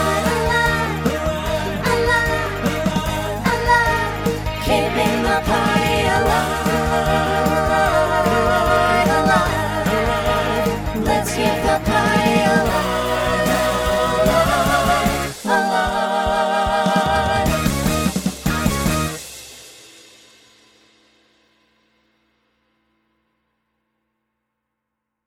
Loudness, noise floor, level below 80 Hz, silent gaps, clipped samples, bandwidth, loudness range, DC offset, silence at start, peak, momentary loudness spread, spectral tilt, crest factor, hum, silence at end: -18 LUFS; -79 dBFS; -32 dBFS; none; under 0.1%; over 20 kHz; 5 LU; under 0.1%; 0 s; -2 dBFS; 6 LU; -4.5 dB/octave; 16 dB; none; 5.5 s